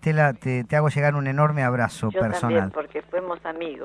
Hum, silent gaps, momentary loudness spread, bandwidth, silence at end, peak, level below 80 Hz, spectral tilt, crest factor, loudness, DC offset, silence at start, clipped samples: none; none; 9 LU; 11 kHz; 0 s; -8 dBFS; -54 dBFS; -7.5 dB/octave; 16 dB; -23 LUFS; under 0.1%; 0 s; under 0.1%